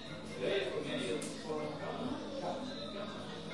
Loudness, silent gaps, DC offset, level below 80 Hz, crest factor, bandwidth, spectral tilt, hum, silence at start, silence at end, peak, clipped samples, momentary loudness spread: -40 LUFS; none; 0.2%; -66 dBFS; 16 dB; 11.5 kHz; -4.5 dB/octave; none; 0 s; 0 s; -22 dBFS; under 0.1%; 7 LU